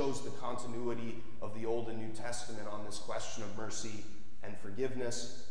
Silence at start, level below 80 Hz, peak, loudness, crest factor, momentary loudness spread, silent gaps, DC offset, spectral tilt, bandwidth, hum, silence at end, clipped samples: 0 s; -62 dBFS; -20 dBFS; -41 LUFS; 16 dB; 9 LU; none; 3%; -4.5 dB/octave; 11 kHz; none; 0 s; under 0.1%